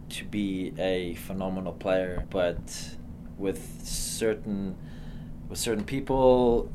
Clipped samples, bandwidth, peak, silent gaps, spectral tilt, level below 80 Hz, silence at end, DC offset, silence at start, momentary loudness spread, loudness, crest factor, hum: under 0.1%; 15.5 kHz; -8 dBFS; none; -5 dB/octave; -42 dBFS; 0 s; under 0.1%; 0 s; 19 LU; -29 LUFS; 20 dB; none